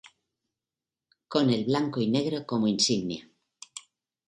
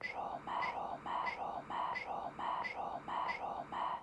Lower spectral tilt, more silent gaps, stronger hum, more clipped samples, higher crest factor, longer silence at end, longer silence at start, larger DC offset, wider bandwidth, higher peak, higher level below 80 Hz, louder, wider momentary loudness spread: about the same, -4.5 dB/octave vs -4.5 dB/octave; neither; neither; neither; first, 20 dB vs 14 dB; first, 0.5 s vs 0 s; first, 1.3 s vs 0 s; neither; about the same, 11.5 kHz vs 11 kHz; first, -10 dBFS vs -26 dBFS; about the same, -68 dBFS vs -70 dBFS; first, -27 LUFS vs -41 LUFS; first, 19 LU vs 4 LU